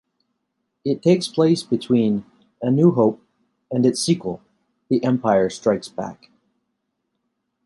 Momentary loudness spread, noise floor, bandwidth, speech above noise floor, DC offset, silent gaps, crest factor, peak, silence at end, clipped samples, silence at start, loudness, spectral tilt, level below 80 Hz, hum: 14 LU; -75 dBFS; 11.5 kHz; 56 dB; under 0.1%; none; 18 dB; -4 dBFS; 1.5 s; under 0.1%; 0.85 s; -20 LUFS; -6.5 dB/octave; -62 dBFS; none